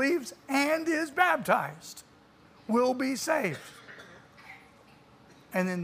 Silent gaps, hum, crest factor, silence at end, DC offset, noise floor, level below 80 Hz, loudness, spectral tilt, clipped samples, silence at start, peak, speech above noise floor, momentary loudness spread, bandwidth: none; none; 20 dB; 0 s; under 0.1%; -58 dBFS; -72 dBFS; -28 LUFS; -4.5 dB/octave; under 0.1%; 0 s; -10 dBFS; 29 dB; 22 LU; 15.5 kHz